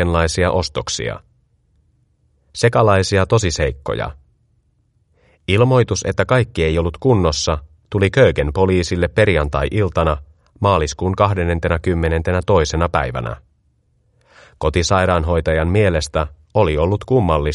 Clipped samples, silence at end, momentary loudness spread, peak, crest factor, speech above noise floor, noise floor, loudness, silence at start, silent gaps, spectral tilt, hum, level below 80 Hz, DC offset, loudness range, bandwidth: under 0.1%; 0 s; 9 LU; 0 dBFS; 18 dB; 45 dB; -61 dBFS; -17 LUFS; 0 s; none; -5.5 dB/octave; none; -30 dBFS; under 0.1%; 3 LU; 11.5 kHz